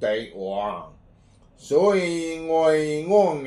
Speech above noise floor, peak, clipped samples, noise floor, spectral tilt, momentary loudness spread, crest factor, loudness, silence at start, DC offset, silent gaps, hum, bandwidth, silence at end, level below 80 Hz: 32 dB; -6 dBFS; under 0.1%; -54 dBFS; -5.5 dB/octave; 10 LU; 16 dB; -22 LUFS; 0 s; under 0.1%; none; none; 11.5 kHz; 0 s; -56 dBFS